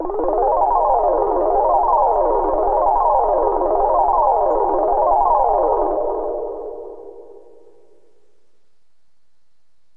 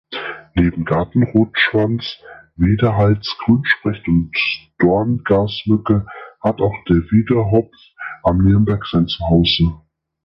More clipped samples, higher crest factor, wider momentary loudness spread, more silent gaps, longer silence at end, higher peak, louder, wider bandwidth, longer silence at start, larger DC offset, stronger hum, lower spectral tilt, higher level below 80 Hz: neither; about the same, 14 dB vs 16 dB; about the same, 10 LU vs 8 LU; neither; first, 2.65 s vs 0.5 s; second, -4 dBFS vs 0 dBFS; about the same, -17 LUFS vs -17 LUFS; second, 2.6 kHz vs 6 kHz; about the same, 0 s vs 0.1 s; first, 0.7% vs under 0.1%; neither; about the same, -10 dB/octave vs -9 dB/octave; about the same, -36 dBFS vs -34 dBFS